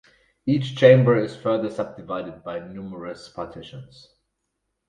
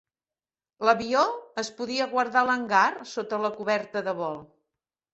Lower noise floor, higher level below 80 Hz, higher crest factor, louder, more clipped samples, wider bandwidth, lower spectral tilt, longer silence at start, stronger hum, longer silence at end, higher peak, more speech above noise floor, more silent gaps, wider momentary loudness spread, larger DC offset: second, -78 dBFS vs under -90 dBFS; first, -60 dBFS vs -70 dBFS; about the same, 22 dB vs 22 dB; first, -21 LUFS vs -26 LUFS; neither; first, 9.2 kHz vs 8.2 kHz; first, -8 dB/octave vs -3.5 dB/octave; second, 0.45 s vs 0.8 s; neither; first, 1.05 s vs 0.7 s; first, -2 dBFS vs -6 dBFS; second, 56 dB vs over 64 dB; neither; first, 21 LU vs 10 LU; neither